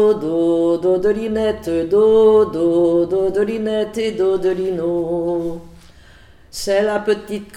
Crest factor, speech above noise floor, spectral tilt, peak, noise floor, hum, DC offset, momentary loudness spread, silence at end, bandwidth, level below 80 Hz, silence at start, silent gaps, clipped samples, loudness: 12 dB; 28 dB; -6 dB/octave; -4 dBFS; -45 dBFS; none; under 0.1%; 9 LU; 0 s; 14 kHz; -46 dBFS; 0 s; none; under 0.1%; -17 LUFS